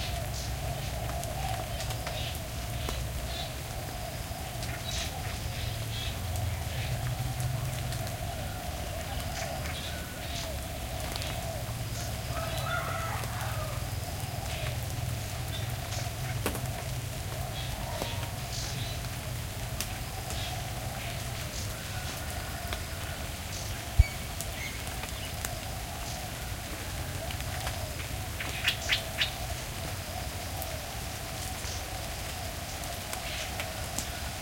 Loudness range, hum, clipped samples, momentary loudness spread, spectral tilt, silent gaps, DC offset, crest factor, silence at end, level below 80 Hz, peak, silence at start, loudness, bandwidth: 3 LU; none; under 0.1%; 4 LU; -3.5 dB/octave; none; under 0.1%; 28 dB; 0 s; -42 dBFS; -8 dBFS; 0 s; -34 LUFS; 17 kHz